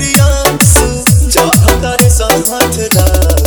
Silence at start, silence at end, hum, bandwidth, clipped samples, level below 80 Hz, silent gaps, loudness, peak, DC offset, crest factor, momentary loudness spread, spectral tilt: 0 s; 0 s; none; over 20 kHz; 1%; -14 dBFS; none; -8 LUFS; 0 dBFS; under 0.1%; 8 dB; 3 LU; -4 dB/octave